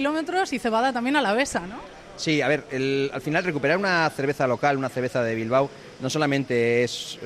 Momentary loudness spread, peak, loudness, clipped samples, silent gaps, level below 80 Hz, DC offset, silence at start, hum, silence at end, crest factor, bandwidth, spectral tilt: 7 LU; -8 dBFS; -24 LUFS; under 0.1%; none; -58 dBFS; under 0.1%; 0 s; none; 0 s; 16 dB; 14.5 kHz; -5 dB/octave